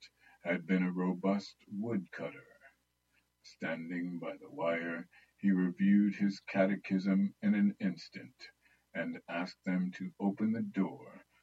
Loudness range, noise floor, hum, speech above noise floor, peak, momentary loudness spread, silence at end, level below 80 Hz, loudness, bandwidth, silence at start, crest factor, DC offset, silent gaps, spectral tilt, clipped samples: 9 LU; -77 dBFS; none; 43 dB; -16 dBFS; 14 LU; 0.25 s; -84 dBFS; -35 LUFS; 7.6 kHz; 0 s; 18 dB; under 0.1%; none; -8 dB/octave; under 0.1%